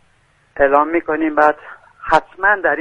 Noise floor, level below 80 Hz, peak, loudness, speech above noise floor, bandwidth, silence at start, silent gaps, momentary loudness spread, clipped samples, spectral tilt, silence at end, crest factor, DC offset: -56 dBFS; -44 dBFS; 0 dBFS; -15 LUFS; 41 dB; 10.5 kHz; 0.55 s; none; 14 LU; under 0.1%; -5.5 dB/octave; 0 s; 16 dB; under 0.1%